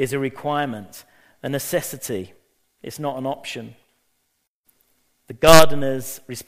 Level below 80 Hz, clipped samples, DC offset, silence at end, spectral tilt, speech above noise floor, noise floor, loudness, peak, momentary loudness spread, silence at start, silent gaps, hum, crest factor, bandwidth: -42 dBFS; under 0.1%; under 0.1%; 0 s; -4 dB/octave; 54 dB; -72 dBFS; -20 LUFS; 0 dBFS; 27 LU; 0 s; 4.47-4.64 s; none; 20 dB; 15.5 kHz